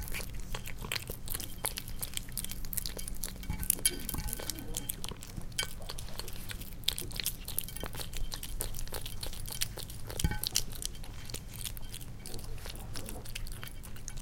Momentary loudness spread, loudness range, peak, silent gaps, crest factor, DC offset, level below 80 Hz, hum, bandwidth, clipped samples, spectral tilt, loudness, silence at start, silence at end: 11 LU; 3 LU; -4 dBFS; none; 32 dB; under 0.1%; -42 dBFS; none; 17 kHz; under 0.1%; -2 dB/octave; -38 LUFS; 0 s; 0 s